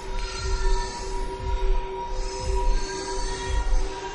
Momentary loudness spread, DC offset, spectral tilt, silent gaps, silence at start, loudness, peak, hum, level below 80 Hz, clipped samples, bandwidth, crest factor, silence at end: 4 LU; under 0.1%; -4 dB/octave; none; 0 s; -30 LUFS; -10 dBFS; none; -26 dBFS; under 0.1%; 10.5 kHz; 14 dB; 0 s